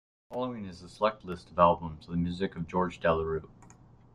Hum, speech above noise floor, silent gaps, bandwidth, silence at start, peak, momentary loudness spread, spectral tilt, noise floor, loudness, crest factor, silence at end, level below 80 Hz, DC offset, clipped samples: none; 26 dB; none; 10.5 kHz; 0.3 s; -8 dBFS; 15 LU; -7.5 dB/octave; -56 dBFS; -30 LUFS; 22 dB; 0.45 s; -56 dBFS; under 0.1%; under 0.1%